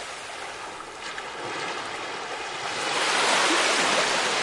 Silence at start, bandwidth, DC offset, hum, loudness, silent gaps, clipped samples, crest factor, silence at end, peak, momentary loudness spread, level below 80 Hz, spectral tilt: 0 s; 11.5 kHz; under 0.1%; none; -25 LUFS; none; under 0.1%; 18 dB; 0 s; -8 dBFS; 15 LU; -64 dBFS; -0.5 dB/octave